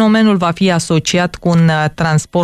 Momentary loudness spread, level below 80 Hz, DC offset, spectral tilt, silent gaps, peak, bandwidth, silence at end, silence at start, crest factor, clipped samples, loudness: 4 LU; -42 dBFS; under 0.1%; -5.5 dB/octave; none; -2 dBFS; 12 kHz; 0 s; 0 s; 10 dB; under 0.1%; -13 LUFS